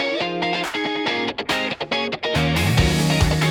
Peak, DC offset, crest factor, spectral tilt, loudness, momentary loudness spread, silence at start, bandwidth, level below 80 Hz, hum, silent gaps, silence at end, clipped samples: -6 dBFS; under 0.1%; 16 dB; -5 dB/octave; -21 LUFS; 5 LU; 0 s; 18 kHz; -32 dBFS; none; none; 0 s; under 0.1%